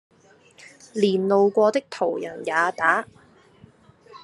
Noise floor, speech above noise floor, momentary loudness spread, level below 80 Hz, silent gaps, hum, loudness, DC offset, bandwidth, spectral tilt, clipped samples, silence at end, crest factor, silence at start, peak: -54 dBFS; 32 dB; 10 LU; -72 dBFS; none; none; -22 LUFS; under 0.1%; 11.5 kHz; -5.5 dB/octave; under 0.1%; 0.05 s; 20 dB; 0.95 s; -4 dBFS